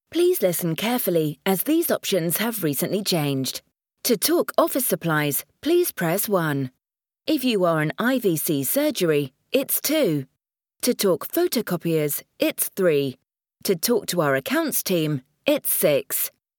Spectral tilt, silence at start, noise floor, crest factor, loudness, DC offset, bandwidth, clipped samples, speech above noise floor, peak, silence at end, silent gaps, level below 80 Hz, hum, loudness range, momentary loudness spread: -4 dB/octave; 0.1 s; -84 dBFS; 18 dB; -22 LUFS; under 0.1%; 19 kHz; under 0.1%; 62 dB; -4 dBFS; 0.3 s; none; -70 dBFS; none; 1 LU; 6 LU